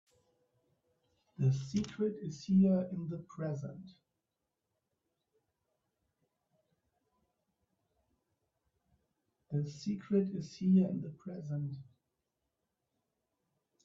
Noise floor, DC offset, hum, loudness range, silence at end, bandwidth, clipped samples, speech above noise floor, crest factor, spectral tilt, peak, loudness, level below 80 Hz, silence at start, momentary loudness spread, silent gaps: -88 dBFS; under 0.1%; none; 13 LU; 2 s; 7.4 kHz; under 0.1%; 54 dB; 18 dB; -8.5 dB/octave; -20 dBFS; -35 LUFS; -72 dBFS; 1.4 s; 14 LU; none